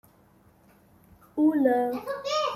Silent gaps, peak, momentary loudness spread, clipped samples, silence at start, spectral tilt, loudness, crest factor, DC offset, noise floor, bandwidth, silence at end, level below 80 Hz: none; -10 dBFS; 10 LU; under 0.1%; 1.35 s; -4.5 dB/octave; -26 LUFS; 18 dB; under 0.1%; -59 dBFS; 14 kHz; 0 s; -68 dBFS